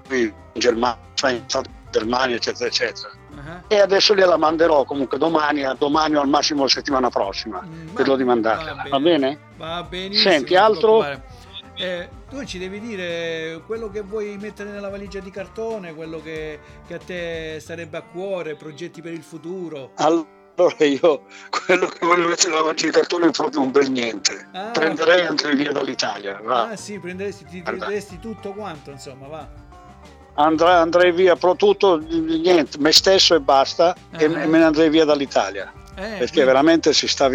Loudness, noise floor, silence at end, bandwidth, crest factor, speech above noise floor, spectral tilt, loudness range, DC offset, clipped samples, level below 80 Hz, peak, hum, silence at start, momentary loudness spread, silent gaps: -18 LUFS; -44 dBFS; 0 s; 17.5 kHz; 20 dB; 25 dB; -3.5 dB/octave; 15 LU; under 0.1%; under 0.1%; -50 dBFS; 0 dBFS; none; 0.05 s; 18 LU; none